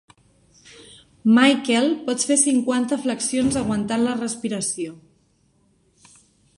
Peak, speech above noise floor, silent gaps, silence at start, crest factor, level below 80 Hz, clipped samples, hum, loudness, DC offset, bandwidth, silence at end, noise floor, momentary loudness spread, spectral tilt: -4 dBFS; 42 dB; none; 0.8 s; 20 dB; -56 dBFS; under 0.1%; none; -20 LUFS; under 0.1%; 11.5 kHz; 1.6 s; -62 dBFS; 10 LU; -3 dB/octave